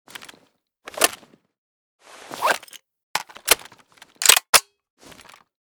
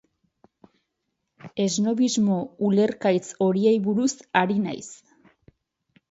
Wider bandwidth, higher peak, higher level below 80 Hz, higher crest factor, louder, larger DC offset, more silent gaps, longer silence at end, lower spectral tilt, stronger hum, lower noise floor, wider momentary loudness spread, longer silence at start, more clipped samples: first, over 20 kHz vs 8 kHz; first, 0 dBFS vs -4 dBFS; first, -60 dBFS vs -70 dBFS; first, 26 dB vs 20 dB; first, -19 LUFS vs -23 LUFS; neither; first, 1.58-1.99 s, 3.03-3.14 s, 4.49-4.53 s vs none; about the same, 1.15 s vs 1.15 s; second, 1.5 dB/octave vs -5.5 dB/octave; neither; second, -62 dBFS vs -79 dBFS; first, 24 LU vs 8 LU; second, 0.95 s vs 1.45 s; neither